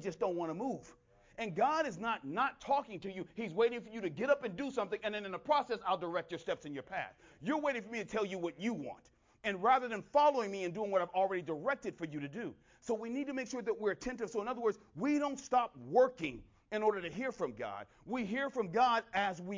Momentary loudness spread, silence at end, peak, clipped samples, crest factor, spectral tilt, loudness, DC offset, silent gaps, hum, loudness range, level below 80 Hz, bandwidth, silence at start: 12 LU; 0 s; -16 dBFS; under 0.1%; 20 dB; -5 dB/octave; -36 LUFS; under 0.1%; none; none; 4 LU; -70 dBFS; 7.6 kHz; 0 s